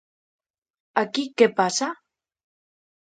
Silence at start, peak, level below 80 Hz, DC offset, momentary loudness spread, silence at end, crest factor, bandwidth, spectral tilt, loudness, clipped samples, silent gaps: 0.95 s; -2 dBFS; -76 dBFS; under 0.1%; 11 LU; 1.15 s; 24 dB; 9.4 kHz; -3 dB/octave; -23 LUFS; under 0.1%; none